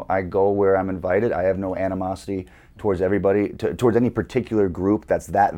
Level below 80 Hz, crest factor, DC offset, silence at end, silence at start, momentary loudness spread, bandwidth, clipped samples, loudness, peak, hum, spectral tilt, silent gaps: -46 dBFS; 16 dB; under 0.1%; 0 s; 0 s; 8 LU; 16 kHz; under 0.1%; -22 LUFS; -4 dBFS; none; -8 dB/octave; none